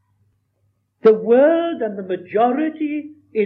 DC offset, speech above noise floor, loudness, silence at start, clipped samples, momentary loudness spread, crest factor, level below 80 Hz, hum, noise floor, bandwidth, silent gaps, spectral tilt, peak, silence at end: under 0.1%; 50 dB; -18 LUFS; 1.05 s; under 0.1%; 13 LU; 14 dB; -78 dBFS; none; -66 dBFS; 5.2 kHz; none; -9 dB/octave; -4 dBFS; 0 s